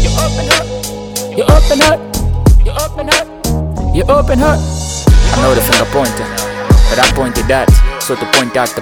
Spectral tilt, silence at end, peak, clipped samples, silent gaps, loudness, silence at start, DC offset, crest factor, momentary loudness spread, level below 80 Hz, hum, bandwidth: -4.5 dB/octave; 0 s; 0 dBFS; 0.3%; none; -12 LUFS; 0 s; under 0.1%; 10 dB; 8 LU; -14 dBFS; none; 19 kHz